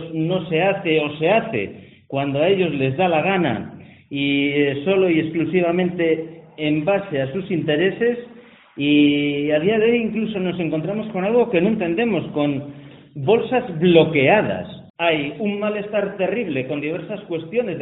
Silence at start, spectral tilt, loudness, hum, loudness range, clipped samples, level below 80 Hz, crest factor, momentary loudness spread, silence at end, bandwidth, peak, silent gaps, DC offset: 0 s; -4.5 dB/octave; -20 LUFS; none; 2 LU; under 0.1%; -58 dBFS; 18 dB; 10 LU; 0 s; 4.1 kHz; 0 dBFS; 14.90-14.94 s; under 0.1%